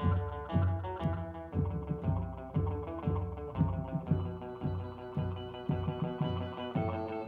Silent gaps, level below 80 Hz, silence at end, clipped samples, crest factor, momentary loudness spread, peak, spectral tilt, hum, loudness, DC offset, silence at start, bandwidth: none; -48 dBFS; 0 s; under 0.1%; 18 dB; 6 LU; -16 dBFS; -10 dB/octave; none; -36 LUFS; under 0.1%; 0 s; 4.4 kHz